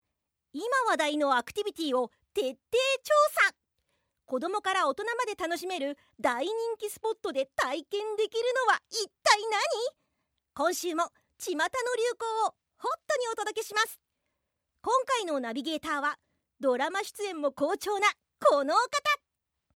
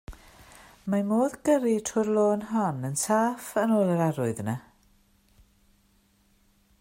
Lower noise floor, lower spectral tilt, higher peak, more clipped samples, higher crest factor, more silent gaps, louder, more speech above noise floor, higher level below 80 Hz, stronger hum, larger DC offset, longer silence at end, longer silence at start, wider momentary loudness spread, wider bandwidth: first, -83 dBFS vs -65 dBFS; second, -1 dB/octave vs -6 dB/octave; first, -6 dBFS vs -10 dBFS; neither; first, 24 dB vs 18 dB; neither; second, -29 LUFS vs -26 LUFS; first, 54 dB vs 39 dB; second, -74 dBFS vs -58 dBFS; neither; neither; second, 0.6 s vs 2.2 s; first, 0.55 s vs 0.1 s; first, 9 LU vs 6 LU; about the same, 17.5 kHz vs 16 kHz